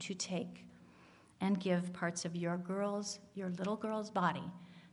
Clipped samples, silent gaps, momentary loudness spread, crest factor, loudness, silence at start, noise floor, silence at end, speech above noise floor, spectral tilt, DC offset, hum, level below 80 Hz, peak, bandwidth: under 0.1%; none; 13 LU; 20 dB; -38 LUFS; 0 s; -63 dBFS; 0.05 s; 25 dB; -5 dB/octave; under 0.1%; none; -80 dBFS; -20 dBFS; 11.5 kHz